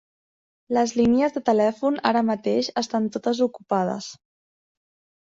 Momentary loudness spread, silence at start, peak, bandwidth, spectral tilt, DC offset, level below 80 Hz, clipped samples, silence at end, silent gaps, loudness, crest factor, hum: 6 LU; 0.7 s; -6 dBFS; 7.8 kHz; -5 dB/octave; under 0.1%; -58 dBFS; under 0.1%; 1.05 s; none; -23 LUFS; 18 dB; none